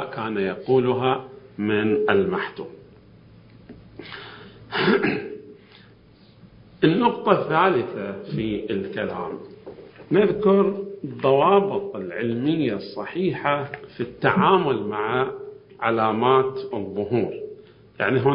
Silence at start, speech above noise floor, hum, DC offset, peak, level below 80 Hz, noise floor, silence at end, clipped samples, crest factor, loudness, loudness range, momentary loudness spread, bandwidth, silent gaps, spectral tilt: 0 s; 30 dB; none; under 0.1%; 0 dBFS; -58 dBFS; -51 dBFS; 0 s; under 0.1%; 22 dB; -22 LUFS; 6 LU; 19 LU; 5.4 kHz; none; -11 dB/octave